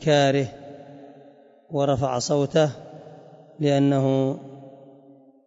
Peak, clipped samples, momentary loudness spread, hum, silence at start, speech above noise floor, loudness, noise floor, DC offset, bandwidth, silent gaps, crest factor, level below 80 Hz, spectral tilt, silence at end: -8 dBFS; under 0.1%; 23 LU; none; 0 s; 31 dB; -23 LUFS; -52 dBFS; under 0.1%; 8 kHz; none; 16 dB; -60 dBFS; -6 dB/octave; 0.75 s